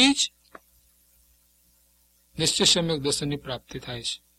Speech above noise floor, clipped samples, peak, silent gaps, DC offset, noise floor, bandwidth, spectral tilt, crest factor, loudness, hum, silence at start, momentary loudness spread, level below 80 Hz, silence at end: 39 dB; under 0.1%; -6 dBFS; none; under 0.1%; -63 dBFS; 16 kHz; -2.5 dB/octave; 22 dB; -24 LUFS; 60 Hz at -55 dBFS; 0 s; 16 LU; -54 dBFS; 0.2 s